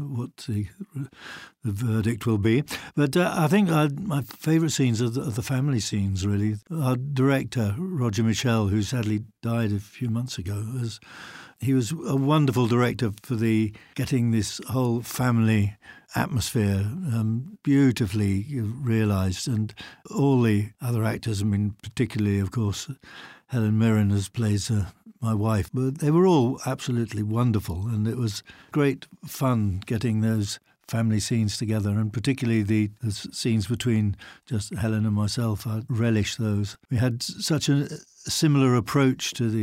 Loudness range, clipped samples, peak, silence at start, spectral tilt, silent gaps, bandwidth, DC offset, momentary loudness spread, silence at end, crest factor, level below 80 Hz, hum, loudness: 3 LU; under 0.1%; -8 dBFS; 0 s; -6 dB/octave; none; 16 kHz; under 0.1%; 10 LU; 0 s; 16 dB; -56 dBFS; none; -25 LUFS